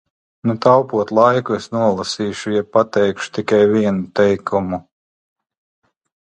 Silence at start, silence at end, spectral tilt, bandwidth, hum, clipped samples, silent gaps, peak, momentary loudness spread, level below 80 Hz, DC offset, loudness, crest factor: 0.45 s; 1.5 s; -6 dB/octave; 9.6 kHz; none; under 0.1%; none; 0 dBFS; 9 LU; -52 dBFS; under 0.1%; -17 LUFS; 18 dB